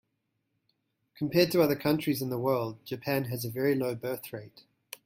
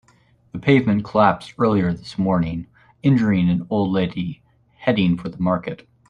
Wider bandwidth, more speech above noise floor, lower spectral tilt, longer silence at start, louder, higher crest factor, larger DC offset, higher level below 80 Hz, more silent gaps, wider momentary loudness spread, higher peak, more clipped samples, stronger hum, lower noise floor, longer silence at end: first, 16.5 kHz vs 9.2 kHz; first, 51 dB vs 38 dB; second, -6 dB/octave vs -8.5 dB/octave; first, 1.2 s vs 0.55 s; second, -29 LUFS vs -20 LUFS; about the same, 22 dB vs 18 dB; neither; second, -68 dBFS vs -50 dBFS; neither; first, 13 LU vs 9 LU; second, -10 dBFS vs -2 dBFS; neither; neither; first, -80 dBFS vs -57 dBFS; second, 0.1 s vs 0.35 s